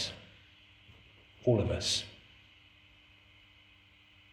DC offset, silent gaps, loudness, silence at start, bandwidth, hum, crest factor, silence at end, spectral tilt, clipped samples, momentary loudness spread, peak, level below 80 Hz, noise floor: under 0.1%; none; -32 LUFS; 0 s; 13.5 kHz; none; 22 dB; 2.15 s; -4.5 dB/octave; under 0.1%; 28 LU; -16 dBFS; -60 dBFS; -62 dBFS